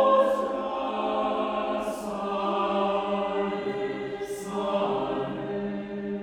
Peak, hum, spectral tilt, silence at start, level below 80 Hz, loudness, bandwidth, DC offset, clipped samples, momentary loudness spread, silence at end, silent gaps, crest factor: -10 dBFS; none; -6 dB/octave; 0 s; -58 dBFS; -28 LUFS; 16 kHz; under 0.1%; under 0.1%; 7 LU; 0 s; none; 18 dB